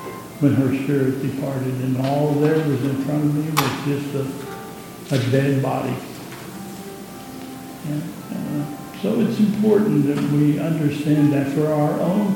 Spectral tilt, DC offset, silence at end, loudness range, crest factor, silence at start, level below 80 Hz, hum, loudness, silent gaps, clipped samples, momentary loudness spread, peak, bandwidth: -7 dB/octave; under 0.1%; 0 s; 8 LU; 20 dB; 0 s; -58 dBFS; none; -21 LUFS; none; under 0.1%; 16 LU; -2 dBFS; 17.5 kHz